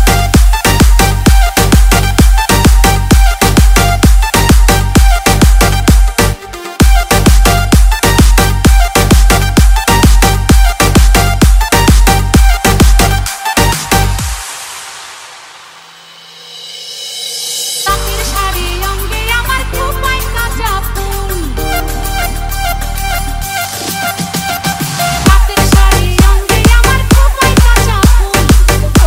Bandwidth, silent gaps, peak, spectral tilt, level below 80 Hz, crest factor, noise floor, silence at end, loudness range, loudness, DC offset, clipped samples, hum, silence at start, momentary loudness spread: 16.5 kHz; none; 0 dBFS; -4 dB/octave; -10 dBFS; 8 dB; -35 dBFS; 0 s; 8 LU; -10 LUFS; under 0.1%; 2%; none; 0 s; 9 LU